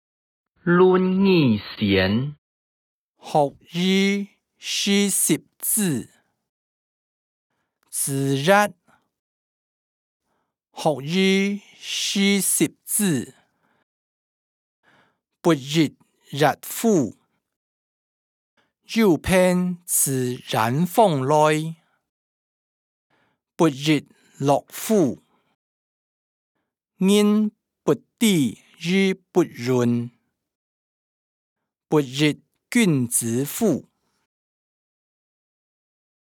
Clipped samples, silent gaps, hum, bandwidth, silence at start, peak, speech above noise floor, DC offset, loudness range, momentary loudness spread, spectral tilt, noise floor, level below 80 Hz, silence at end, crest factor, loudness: under 0.1%; 2.38-3.14 s, 6.49-7.50 s, 9.19-10.20 s, 13.83-14.83 s, 17.56-18.57 s, 22.09-23.10 s, 25.55-26.55 s, 30.55-31.56 s; none; 19.5 kHz; 0.65 s; -2 dBFS; 54 dB; under 0.1%; 5 LU; 9 LU; -4.5 dB/octave; -74 dBFS; -58 dBFS; 2.4 s; 20 dB; -21 LUFS